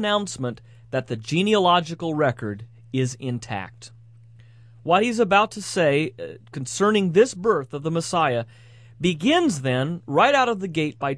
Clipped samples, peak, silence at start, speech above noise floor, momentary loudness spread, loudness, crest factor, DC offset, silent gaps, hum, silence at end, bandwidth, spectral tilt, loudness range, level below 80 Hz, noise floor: under 0.1%; -4 dBFS; 0 s; 26 dB; 14 LU; -22 LUFS; 18 dB; under 0.1%; none; none; 0 s; 11 kHz; -5 dB/octave; 3 LU; -60 dBFS; -48 dBFS